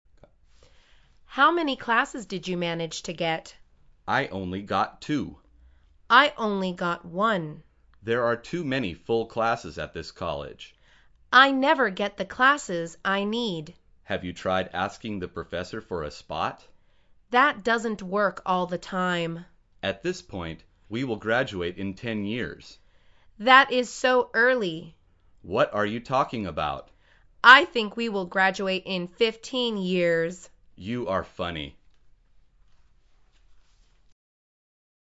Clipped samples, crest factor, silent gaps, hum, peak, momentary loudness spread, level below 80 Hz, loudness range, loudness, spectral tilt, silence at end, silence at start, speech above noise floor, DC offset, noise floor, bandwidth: under 0.1%; 26 dB; none; none; 0 dBFS; 16 LU; -56 dBFS; 9 LU; -25 LUFS; -4.5 dB/octave; 3.35 s; 1.3 s; 33 dB; under 0.1%; -59 dBFS; 8 kHz